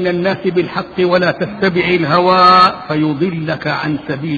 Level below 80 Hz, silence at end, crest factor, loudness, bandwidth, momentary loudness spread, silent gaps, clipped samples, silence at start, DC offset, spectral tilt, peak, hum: -48 dBFS; 0 s; 14 dB; -13 LUFS; 7.2 kHz; 11 LU; none; under 0.1%; 0 s; under 0.1%; -7 dB/octave; 0 dBFS; none